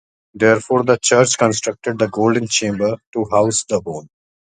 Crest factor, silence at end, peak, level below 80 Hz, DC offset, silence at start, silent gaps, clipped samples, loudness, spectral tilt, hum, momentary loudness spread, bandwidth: 18 dB; 0.45 s; 0 dBFS; -54 dBFS; under 0.1%; 0.35 s; 3.07-3.13 s; under 0.1%; -17 LUFS; -4 dB/octave; none; 9 LU; 9.6 kHz